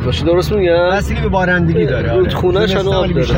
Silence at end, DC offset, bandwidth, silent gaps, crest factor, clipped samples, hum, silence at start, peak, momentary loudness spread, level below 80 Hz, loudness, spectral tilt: 0 s; under 0.1%; 16.5 kHz; none; 10 dB; under 0.1%; none; 0 s; -2 dBFS; 2 LU; -26 dBFS; -14 LUFS; -7 dB/octave